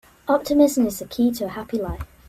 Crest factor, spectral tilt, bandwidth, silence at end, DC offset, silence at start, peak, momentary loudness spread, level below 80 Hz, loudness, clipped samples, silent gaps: 16 dB; -5.5 dB/octave; 16 kHz; 0.25 s; under 0.1%; 0.25 s; -6 dBFS; 11 LU; -42 dBFS; -22 LUFS; under 0.1%; none